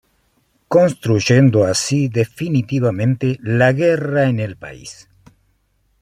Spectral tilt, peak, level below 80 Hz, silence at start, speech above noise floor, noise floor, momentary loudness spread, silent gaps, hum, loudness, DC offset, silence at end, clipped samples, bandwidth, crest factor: -6 dB/octave; -2 dBFS; -54 dBFS; 0.7 s; 47 dB; -62 dBFS; 13 LU; none; none; -16 LUFS; under 0.1%; 1.1 s; under 0.1%; 13 kHz; 16 dB